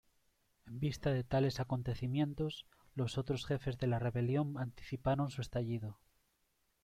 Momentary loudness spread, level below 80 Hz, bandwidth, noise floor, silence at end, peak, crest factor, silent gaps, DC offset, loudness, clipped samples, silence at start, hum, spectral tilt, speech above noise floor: 8 LU; -58 dBFS; 13.5 kHz; -79 dBFS; 0.9 s; -22 dBFS; 16 dB; none; under 0.1%; -38 LUFS; under 0.1%; 0.65 s; none; -7 dB/octave; 42 dB